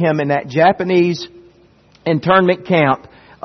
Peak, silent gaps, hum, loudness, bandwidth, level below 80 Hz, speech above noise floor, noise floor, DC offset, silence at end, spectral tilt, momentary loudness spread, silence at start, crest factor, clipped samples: 0 dBFS; none; none; -15 LUFS; 6.4 kHz; -54 dBFS; 35 dB; -50 dBFS; under 0.1%; 0.5 s; -7 dB/octave; 11 LU; 0 s; 16 dB; under 0.1%